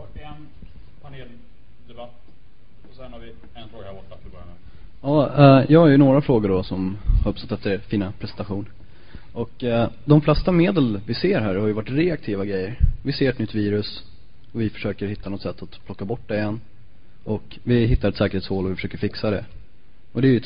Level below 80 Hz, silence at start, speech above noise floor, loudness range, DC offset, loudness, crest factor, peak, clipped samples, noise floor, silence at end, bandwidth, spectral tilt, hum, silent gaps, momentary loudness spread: -34 dBFS; 0 s; 32 dB; 11 LU; 2%; -21 LUFS; 20 dB; -2 dBFS; under 0.1%; -52 dBFS; 0 s; 5.2 kHz; -12.5 dB/octave; none; none; 25 LU